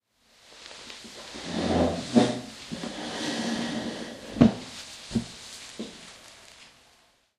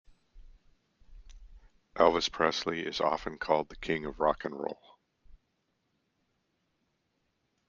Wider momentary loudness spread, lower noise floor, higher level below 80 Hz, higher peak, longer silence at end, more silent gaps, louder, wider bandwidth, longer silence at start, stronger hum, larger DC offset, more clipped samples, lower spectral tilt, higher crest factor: first, 23 LU vs 13 LU; second, -63 dBFS vs -78 dBFS; about the same, -52 dBFS vs -56 dBFS; first, -2 dBFS vs -8 dBFS; second, 0.7 s vs 2.35 s; neither; about the same, -28 LUFS vs -30 LUFS; first, 12.5 kHz vs 7.4 kHz; first, 0.5 s vs 0.35 s; neither; neither; neither; about the same, -5 dB/octave vs -4 dB/octave; about the same, 28 dB vs 26 dB